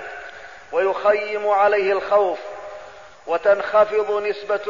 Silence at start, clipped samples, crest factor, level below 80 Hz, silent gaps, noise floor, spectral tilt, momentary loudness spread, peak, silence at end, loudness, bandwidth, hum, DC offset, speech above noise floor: 0 s; under 0.1%; 14 dB; -60 dBFS; none; -41 dBFS; -4.5 dB/octave; 20 LU; -6 dBFS; 0 s; -20 LUFS; 7.4 kHz; none; 0.3%; 22 dB